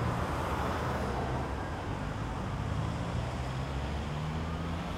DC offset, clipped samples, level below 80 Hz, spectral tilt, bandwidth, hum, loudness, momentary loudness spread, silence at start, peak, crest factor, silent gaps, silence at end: under 0.1%; under 0.1%; -40 dBFS; -6.5 dB/octave; 15.5 kHz; none; -35 LUFS; 4 LU; 0 s; -20 dBFS; 14 dB; none; 0 s